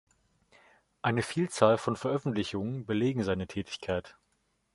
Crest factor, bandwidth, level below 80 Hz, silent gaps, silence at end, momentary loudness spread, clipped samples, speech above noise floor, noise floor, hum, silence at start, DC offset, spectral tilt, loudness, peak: 24 dB; 11.5 kHz; -58 dBFS; none; 0.6 s; 10 LU; under 0.1%; 45 dB; -75 dBFS; none; 1.05 s; under 0.1%; -6 dB/octave; -31 LUFS; -8 dBFS